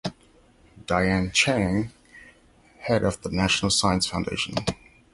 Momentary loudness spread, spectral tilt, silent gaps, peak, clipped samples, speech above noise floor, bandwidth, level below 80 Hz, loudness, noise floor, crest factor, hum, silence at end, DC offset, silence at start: 15 LU; -4 dB/octave; none; -6 dBFS; under 0.1%; 33 dB; 11.5 kHz; -44 dBFS; -24 LUFS; -57 dBFS; 20 dB; none; 0.4 s; under 0.1%; 0.05 s